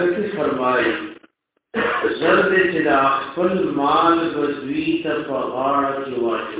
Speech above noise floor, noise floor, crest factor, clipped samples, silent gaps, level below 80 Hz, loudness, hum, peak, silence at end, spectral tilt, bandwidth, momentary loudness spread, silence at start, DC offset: 38 dB; -57 dBFS; 16 dB; under 0.1%; none; -54 dBFS; -19 LUFS; none; -2 dBFS; 0 s; -9 dB/octave; 4 kHz; 7 LU; 0 s; under 0.1%